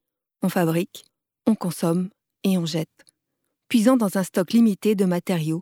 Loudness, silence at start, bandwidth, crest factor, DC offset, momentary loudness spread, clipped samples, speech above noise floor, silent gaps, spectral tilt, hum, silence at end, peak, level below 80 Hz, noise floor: -22 LUFS; 0.4 s; 17 kHz; 18 dB; under 0.1%; 9 LU; under 0.1%; 57 dB; none; -6.5 dB/octave; none; 0 s; -6 dBFS; -72 dBFS; -78 dBFS